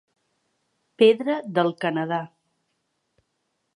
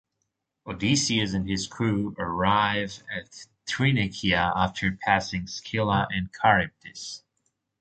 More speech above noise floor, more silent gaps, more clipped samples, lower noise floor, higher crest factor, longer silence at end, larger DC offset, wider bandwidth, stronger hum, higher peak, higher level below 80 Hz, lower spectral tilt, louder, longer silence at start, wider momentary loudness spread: about the same, 54 dB vs 54 dB; neither; neither; second, -75 dBFS vs -80 dBFS; about the same, 22 dB vs 22 dB; first, 1.5 s vs 0.65 s; neither; first, 10.5 kHz vs 9.2 kHz; neither; about the same, -4 dBFS vs -4 dBFS; second, -80 dBFS vs -48 dBFS; first, -7 dB/octave vs -4.5 dB/octave; first, -22 LUFS vs -25 LUFS; first, 1 s vs 0.65 s; second, 11 LU vs 15 LU